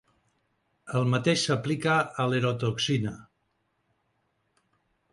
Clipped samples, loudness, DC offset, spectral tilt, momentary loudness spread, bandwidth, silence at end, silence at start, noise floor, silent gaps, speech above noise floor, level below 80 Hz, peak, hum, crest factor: under 0.1%; -27 LUFS; under 0.1%; -5 dB/octave; 7 LU; 11.5 kHz; 1.9 s; 0.85 s; -75 dBFS; none; 48 dB; -64 dBFS; -12 dBFS; none; 18 dB